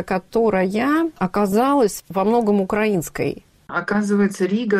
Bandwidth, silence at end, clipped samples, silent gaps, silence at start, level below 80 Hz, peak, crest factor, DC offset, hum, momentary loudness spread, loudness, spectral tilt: 16 kHz; 0 s; under 0.1%; none; 0 s; -50 dBFS; -8 dBFS; 12 dB; under 0.1%; none; 8 LU; -20 LUFS; -6 dB/octave